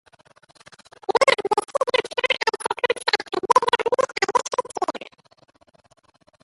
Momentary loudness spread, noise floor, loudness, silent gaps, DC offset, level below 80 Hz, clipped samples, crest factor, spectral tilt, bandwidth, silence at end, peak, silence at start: 10 LU; -50 dBFS; -22 LUFS; none; under 0.1%; -66 dBFS; under 0.1%; 22 dB; -1.5 dB/octave; 11.5 kHz; 1.4 s; -2 dBFS; 1.1 s